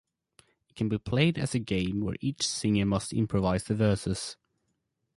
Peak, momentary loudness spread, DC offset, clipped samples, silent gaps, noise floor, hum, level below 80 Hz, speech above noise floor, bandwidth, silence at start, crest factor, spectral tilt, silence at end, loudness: -12 dBFS; 7 LU; under 0.1%; under 0.1%; none; -79 dBFS; none; -50 dBFS; 51 dB; 11.5 kHz; 0.75 s; 18 dB; -5.5 dB/octave; 0.85 s; -29 LUFS